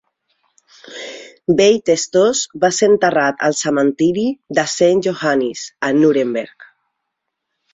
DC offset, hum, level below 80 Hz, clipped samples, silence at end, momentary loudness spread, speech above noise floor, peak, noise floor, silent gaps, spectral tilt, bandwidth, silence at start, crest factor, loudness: under 0.1%; none; -58 dBFS; under 0.1%; 1.1 s; 14 LU; 61 dB; -2 dBFS; -76 dBFS; none; -4 dB/octave; 8.4 kHz; 0.85 s; 16 dB; -16 LUFS